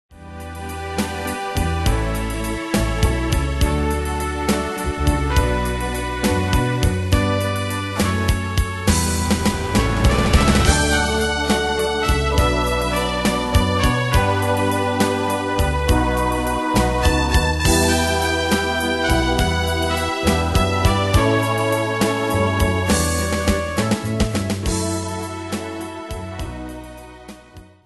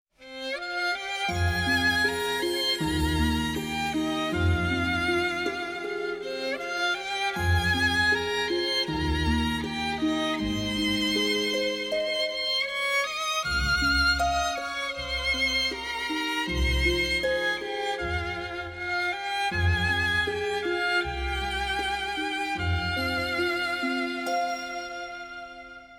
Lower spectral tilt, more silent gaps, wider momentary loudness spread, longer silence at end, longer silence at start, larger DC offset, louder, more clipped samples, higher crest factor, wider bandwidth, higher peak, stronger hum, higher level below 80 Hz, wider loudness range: about the same, -4.5 dB/octave vs -4 dB/octave; neither; about the same, 10 LU vs 8 LU; first, 0.25 s vs 0 s; about the same, 0.1 s vs 0.2 s; neither; first, -19 LUFS vs -26 LUFS; neither; about the same, 18 dB vs 14 dB; second, 12.5 kHz vs 16.5 kHz; first, 0 dBFS vs -12 dBFS; neither; first, -26 dBFS vs -38 dBFS; about the same, 4 LU vs 2 LU